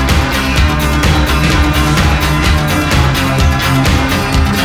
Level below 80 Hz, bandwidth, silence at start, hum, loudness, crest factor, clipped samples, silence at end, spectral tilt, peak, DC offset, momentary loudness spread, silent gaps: -16 dBFS; over 20 kHz; 0 s; none; -11 LUFS; 10 dB; under 0.1%; 0 s; -5 dB/octave; 0 dBFS; under 0.1%; 1 LU; none